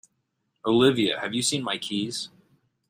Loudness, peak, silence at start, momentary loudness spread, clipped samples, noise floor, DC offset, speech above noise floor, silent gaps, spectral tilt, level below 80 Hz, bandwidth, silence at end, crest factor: -25 LUFS; -6 dBFS; 0.65 s; 13 LU; under 0.1%; -76 dBFS; under 0.1%; 52 dB; none; -4 dB/octave; -68 dBFS; 15.5 kHz; 0.6 s; 20 dB